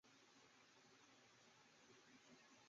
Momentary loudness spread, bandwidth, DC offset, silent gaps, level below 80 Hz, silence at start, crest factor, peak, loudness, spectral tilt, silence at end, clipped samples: 2 LU; 7.4 kHz; under 0.1%; none; under -90 dBFS; 0.05 s; 14 dB; -58 dBFS; -69 LUFS; -1.5 dB/octave; 0 s; under 0.1%